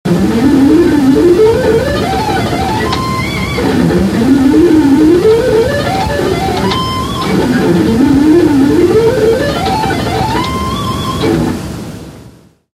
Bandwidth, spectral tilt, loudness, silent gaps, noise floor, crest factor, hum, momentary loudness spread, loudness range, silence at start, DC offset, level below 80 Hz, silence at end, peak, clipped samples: 16 kHz; -6.5 dB/octave; -10 LUFS; none; -39 dBFS; 10 dB; none; 8 LU; 3 LU; 0.05 s; under 0.1%; -28 dBFS; 0.45 s; 0 dBFS; under 0.1%